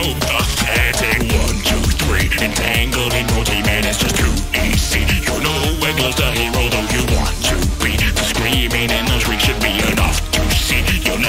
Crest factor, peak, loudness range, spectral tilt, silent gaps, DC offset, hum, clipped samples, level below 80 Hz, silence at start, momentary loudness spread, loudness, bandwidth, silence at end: 14 dB; -2 dBFS; 1 LU; -3.5 dB/octave; none; under 0.1%; none; under 0.1%; -20 dBFS; 0 s; 2 LU; -16 LUFS; 16.5 kHz; 0 s